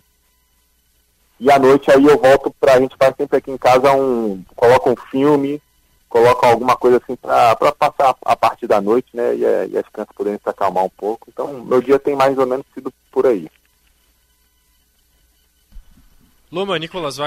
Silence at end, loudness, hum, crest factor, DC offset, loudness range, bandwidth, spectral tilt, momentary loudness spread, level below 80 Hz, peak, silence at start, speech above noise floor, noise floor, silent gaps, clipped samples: 0 s; -15 LUFS; none; 12 dB; under 0.1%; 11 LU; 16 kHz; -5.5 dB/octave; 13 LU; -50 dBFS; -4 dBFS; 1.4 s; 45 dB; -60 dBFS; none; under 0.1%